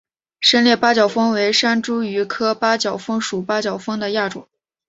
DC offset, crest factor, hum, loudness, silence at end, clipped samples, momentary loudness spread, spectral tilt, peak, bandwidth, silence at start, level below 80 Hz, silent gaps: under 0.1%; 18 dB; none; -18 LUFS; 0.45 s; under 0.1%; 9 LU; -3.5 dB/octave; 0 dBFS; 8 kHz; 0.4 s; -64 dBFS; none